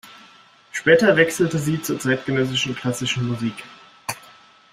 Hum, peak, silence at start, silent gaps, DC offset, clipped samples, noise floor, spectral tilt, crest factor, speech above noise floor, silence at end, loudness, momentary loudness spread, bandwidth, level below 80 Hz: none; -2 dBFS; 0.05 s; none; under 0.1%; under 0.1%; -50 dBFS; -4.5 dB/octave; 20 dB; 30 dB; 0.55 s; -20 LUFS; 16 LU; 16 kHz; -58 dBFS